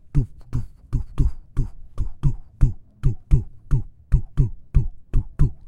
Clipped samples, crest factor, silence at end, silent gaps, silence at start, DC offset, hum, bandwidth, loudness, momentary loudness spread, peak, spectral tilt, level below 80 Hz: under 0.1%; 20 dB; 0 s; none; 0.15 s; under 0.1%; none; 3.3 kHz; -27 LUFS; 8 LU; -2 dBFS; -9.5 dB/octave; -24 dBFS